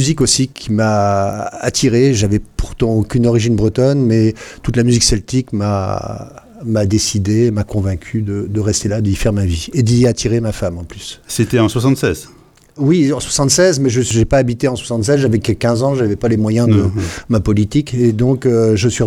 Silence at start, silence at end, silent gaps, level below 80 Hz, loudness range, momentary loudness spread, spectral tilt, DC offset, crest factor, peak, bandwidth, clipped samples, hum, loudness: 0 s; 0 s; none; -32 dBFS; 3 LU; 8 LU; -5.5 dB/octave; under 0.1%; 14 dB; 0 dBFS; 15 kHz; under 0.1%; none; -15 LUFS